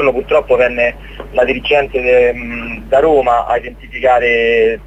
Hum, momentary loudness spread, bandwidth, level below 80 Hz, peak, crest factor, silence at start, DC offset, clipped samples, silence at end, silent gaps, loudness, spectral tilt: none; 10 LU; 9 kHz; -34 dBFS; 0 dBFS; 12 dB; 0 s; under 0.1%; under 0.1%; 0 s; none; -13 LUFS; -5.5 dB/octave